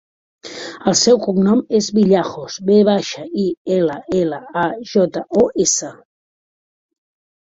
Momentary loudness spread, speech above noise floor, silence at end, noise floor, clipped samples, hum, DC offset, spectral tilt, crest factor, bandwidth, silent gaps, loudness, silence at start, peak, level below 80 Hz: 11 LU; over 74 dB; 1.65 s; under -90 dBFS; under 0.1%; none; under 0.1%; -4.5 dB/octave; 16 dB; 8 kHz; 3.57-3.65 s; -16 LUFS; 0.45 s; -2 dBFS; -56 dBFS